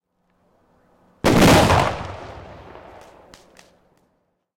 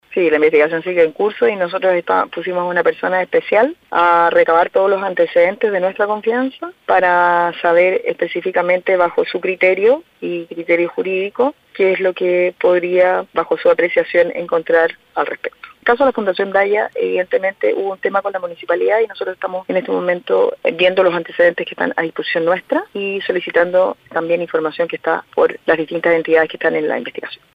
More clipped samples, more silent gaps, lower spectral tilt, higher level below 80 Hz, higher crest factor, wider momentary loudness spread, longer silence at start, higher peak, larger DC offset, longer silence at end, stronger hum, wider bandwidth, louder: neither; neither; second, -5 dB/octave vs -7 dB/octave; first, -38 dBFS vs -60 dBFS; about the same, 16 dB vs 14 dB; first, 28 LU vs 7 LU; first, 1.25 s vs 0.1 s; second, -6 dBFS vs 0 dBFS; neither; first, 2.15 s vs 0.2 s; neither; first, 16.5 kHz vs 5.2 kHz; about the same, -16 LUFS vs -16 LUFS